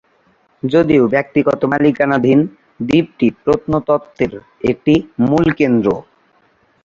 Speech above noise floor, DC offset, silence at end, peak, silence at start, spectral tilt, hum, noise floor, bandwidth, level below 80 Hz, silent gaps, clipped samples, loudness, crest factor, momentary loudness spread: 42 dB; under 0.1%; 0.85 s; 0 dBFS; 0.65 s; -8 dB/octave; none; -56 dBFS; 7.4 kHz; -46 dBFS; none; under 0.1%; -15 LUFS; 14 dB; 9 LU